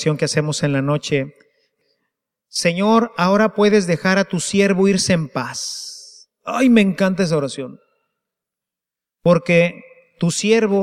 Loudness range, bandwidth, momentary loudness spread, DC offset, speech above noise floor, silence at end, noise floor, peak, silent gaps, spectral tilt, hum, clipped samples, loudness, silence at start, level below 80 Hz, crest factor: 4 LU; 14 kHz; 12 LU; under 0.1%; 70 dB; 0 s; -87 dBFS; -2 dBFS; none; -5 dB/octave; none; under 0.1%; -17 LUFS; 0 s; -58 dBFS; 16 dB